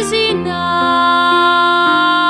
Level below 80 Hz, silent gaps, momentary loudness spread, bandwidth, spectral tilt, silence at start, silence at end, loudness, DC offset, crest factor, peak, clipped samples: -48 dBFS; none; 5 LU; 12.5 kHz; -3.5 dB/octave; 0 s; 0 s; -12 LUFS; under 0.1%; 10 dB; -2 dBFS; under 0.1%